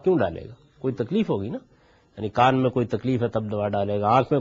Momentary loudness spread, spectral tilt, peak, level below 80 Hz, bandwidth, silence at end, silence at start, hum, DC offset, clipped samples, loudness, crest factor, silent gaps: 14 LU; -6 dB/octave; -6 dBFS; -56 dBFS; 7.4 kHz; 0 s; 0.05 s; none; under 0.1%; under 0.1%; -24 LUFS; 18 dB; none